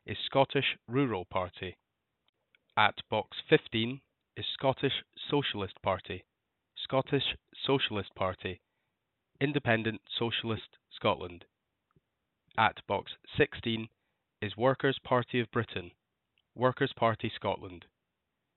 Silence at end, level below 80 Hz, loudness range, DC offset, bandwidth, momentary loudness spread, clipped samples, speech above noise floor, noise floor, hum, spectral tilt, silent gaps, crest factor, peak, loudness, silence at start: 0.8 s; -66 dBFS; 3 LU; under 0.1%; 4.3 kHz; 13 LU; under 0.1%; 53 dB; -84 dBFS; none; -3 dB/octave; 2.29-2.33 s; 26 dB; -8 dBFS; -32 LUFS; 0.05 s